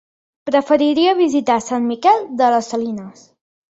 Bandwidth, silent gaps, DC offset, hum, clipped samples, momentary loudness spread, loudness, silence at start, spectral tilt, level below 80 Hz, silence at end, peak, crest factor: 8 kHz; none; under 0.1%; none; under 0.1%; 9 LU; -16 LUFS; 0.45 s; -4 dB/octave; -62 dBFS; 0.6 s; -2 dBFS; 16 dB